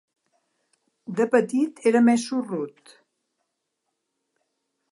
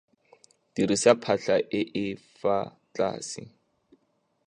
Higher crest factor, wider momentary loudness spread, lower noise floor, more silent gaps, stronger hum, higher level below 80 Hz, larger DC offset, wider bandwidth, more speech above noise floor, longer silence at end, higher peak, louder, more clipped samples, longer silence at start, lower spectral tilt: about the same, 20 dB vs 24 dB; about the same, 14 LU vs 16 LU; first, -79 dBFS vs -72 dBFS; neither; neither; second, -78 dBFS vs -66 dBFS; neither; about the same, 11.5 kHz vs 11 kHz; first, 57 dB vs 46 dB; first, 2.2 s vs 1 s; about the same, -6 dBFS vs -4 dBFS; first, -22 LUFS vs -27 LUFS; neither; first, 1.1 s vs 0.75 s; about the same, -5.5 dB/octave vs -4.5 dB/octave